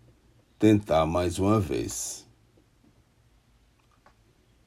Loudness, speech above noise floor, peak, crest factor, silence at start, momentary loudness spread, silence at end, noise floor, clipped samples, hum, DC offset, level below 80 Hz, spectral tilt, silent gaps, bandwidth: -25 LUFS; 39 dB; -8 dBFS; 20 dB; 0.6 s; 11 LU; 2.45 s; -63 dBFS; under 0.1%; none; under 0.1%; -52 dBFS; -6 dB/octave; none; 16 kHz